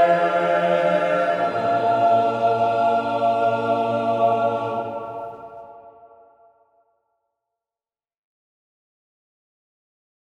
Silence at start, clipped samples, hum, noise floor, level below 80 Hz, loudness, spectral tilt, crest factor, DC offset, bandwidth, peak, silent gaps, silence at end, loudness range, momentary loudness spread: 0 s; under 0.1%; none; under -90 dBFS; -68 dBFS; -20 LUFS; -6.5 dB/octave; 16 dB; under 0.1%; 8.8 kHz; -8 dBFS; none; 4.5 s; 14 LU; 14 LU